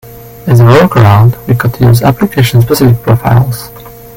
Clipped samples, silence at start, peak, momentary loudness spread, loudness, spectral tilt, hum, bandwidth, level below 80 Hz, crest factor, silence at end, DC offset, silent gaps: 1%; 0.05 s; 0 dBFS; 9 LU; -7 LUFS; -7 dB/octave; none; 17 kHz; -32 dBFS; 8 dB; 0.1 s; under 0.1%; none